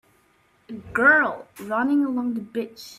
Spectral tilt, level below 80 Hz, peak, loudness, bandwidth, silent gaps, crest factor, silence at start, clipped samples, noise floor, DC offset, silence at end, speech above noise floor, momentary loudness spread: -5.5 dB/octave; -60 dBFS; -6 dBFS; -22 LUFS; 15 kHz; none; 18 dB; 0.7 s; under 0.1%; -62 dBFS; under 0.1%; 0.05 s; 39 dB; 19 LU